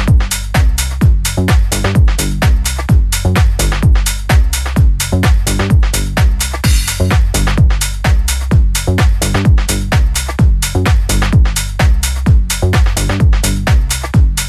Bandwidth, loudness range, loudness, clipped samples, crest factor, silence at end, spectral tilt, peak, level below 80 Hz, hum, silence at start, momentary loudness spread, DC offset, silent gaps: 14.5 kHz; 0 LU; -13 LUFS; under 0.1%; 10 dB; 0 s; -4.5 dB/octave; 0 dBFS; -12 dBFS; none; 0 s; 2 LU; under 0.1%; none